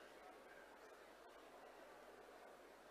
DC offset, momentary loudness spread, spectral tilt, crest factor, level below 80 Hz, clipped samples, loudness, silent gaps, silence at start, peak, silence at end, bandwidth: under 0.1%; 1 LU; -2.5 dB/octave; 14 dB; -86 dBFS; under 0.1%; -62 LUFS; none; 0 s; -48 dBFS; 0 s; 15 kHz